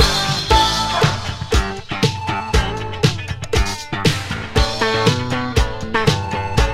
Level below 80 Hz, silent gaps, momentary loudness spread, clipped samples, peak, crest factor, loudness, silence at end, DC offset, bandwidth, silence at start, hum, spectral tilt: -24 dBFS; none; 7 LU; under 0.1%; 0 dBFS; 18 dB; -18 LUFS; 0 s; under 0.1%; 16 kHz; 0 s; none; -4.5 dB/octave